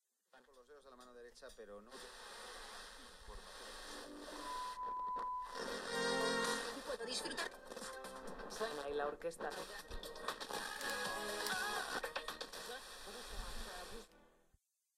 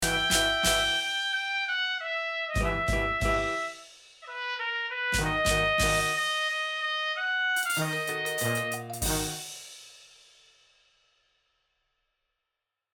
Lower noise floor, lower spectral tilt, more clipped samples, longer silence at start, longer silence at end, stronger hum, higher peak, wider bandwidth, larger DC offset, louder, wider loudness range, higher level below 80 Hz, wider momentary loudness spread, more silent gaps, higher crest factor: second, -78 dBFS vs -86 dBFS; about the same, -2 dB/octave vs -2.5 dB/octave; neither; first, 0.35 s vs 0 s; second, 0.65 s vs 2.9 s; neither; second, -24 dBFS vs -12 dBFS; second, 16 kHz vs 19 kHz; neither; second, -44 LUFS vs -27 LUFS; first, 11 LU vs 8 LU; second, -60 dBFS vs -42 dBFS; first, 16 LU vs 11 LU; neither; about the same, 20 dB vs 18 dB